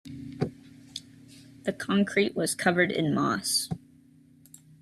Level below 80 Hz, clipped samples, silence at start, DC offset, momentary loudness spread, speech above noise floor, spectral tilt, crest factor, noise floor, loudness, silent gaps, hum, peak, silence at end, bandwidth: -64 dBFS; under 0.1%; 0.05 s; under 0.1%; 18 LU; 31 dB; -4 dB/octave; 20 dB; -57 dBFS; -27 LUFS; none; none; -10 dBFS; 1.05 s; 13.5 kHz